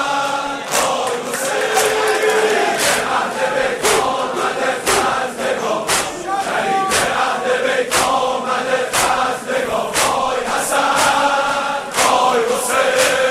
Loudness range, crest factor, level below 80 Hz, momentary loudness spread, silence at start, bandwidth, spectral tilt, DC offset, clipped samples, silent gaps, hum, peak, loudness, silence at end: 2 LU; 16 dB; -48 dBFS; 6 LU; 0 s; 16 kHz; -1.5 dB/octave; under 0.1%; under 0.1%; none; none; 0 dBFS; -16 LUFS; 0 s